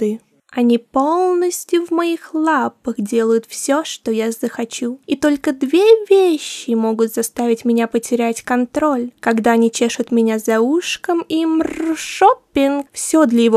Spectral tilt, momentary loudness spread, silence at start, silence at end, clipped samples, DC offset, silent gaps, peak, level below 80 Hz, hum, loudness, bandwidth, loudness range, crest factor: -4 dB/octave; 8 LU; 0 s; 0 s; under 0.1%; under 0.1%; none; 0 dBFS; -58 dBFS; none; -17 LUFS; 15 kHz; 3 LU; 16 dB